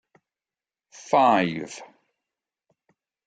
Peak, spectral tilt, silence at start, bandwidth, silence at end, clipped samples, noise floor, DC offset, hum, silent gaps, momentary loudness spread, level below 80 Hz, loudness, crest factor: -6 dBFS; -5 dB/octave; 1.1 s; 9.2 kHz; 1.45 s; under 0.1%; under -90 dBFS; under 0.1%; none; none; 20 LU; -74 dBFS; -22 LUFS; 22 dB